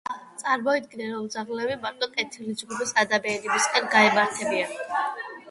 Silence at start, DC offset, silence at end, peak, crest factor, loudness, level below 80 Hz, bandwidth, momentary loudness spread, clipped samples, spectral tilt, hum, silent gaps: 0.1 s; under 0.1%; 0 s; -4 dBFS; 22 dB; -25 LUFS; -70 dBFS; 11.5 kHz; 13 LU; under 0.1%; -2 dB/octave; none; none